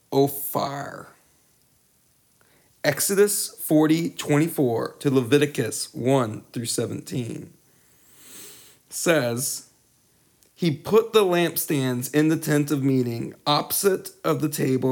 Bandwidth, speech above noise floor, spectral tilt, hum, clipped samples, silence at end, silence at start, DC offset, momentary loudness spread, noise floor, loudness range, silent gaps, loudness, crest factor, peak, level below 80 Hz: over 20 kHz; 40 dB; -5 dB/octave; none; under 0.1%; 0 s; 0.1 s; under 0.1%; 12 LU; -63 dBFS; 7 LU; none; -23 LUFS; 20 dB; -4 dBFS; -68 dBFS